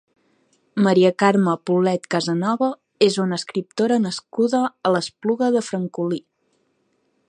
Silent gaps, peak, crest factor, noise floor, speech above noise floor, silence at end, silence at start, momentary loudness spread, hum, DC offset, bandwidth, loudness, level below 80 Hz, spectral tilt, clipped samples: none; -2 dBFS; 20 dB; -67 dBFS; 48 dB; 1.1 s; 0.75 s; 10 LU; none; under 0.1%; 11 kHz; -20 LUFS; -72 dBFS; -6 dB/octave; under 0.1%